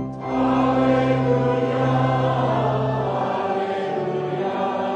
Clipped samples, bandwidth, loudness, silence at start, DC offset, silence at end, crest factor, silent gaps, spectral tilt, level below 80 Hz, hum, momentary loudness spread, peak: under 0.1%; 8.2 kHz; -21 LUFS; 0 s; under 0.1%; 0 s; 14 dB; none; -8 dB/octave; -48 dBFS; none; 6 LU; -8 dBFS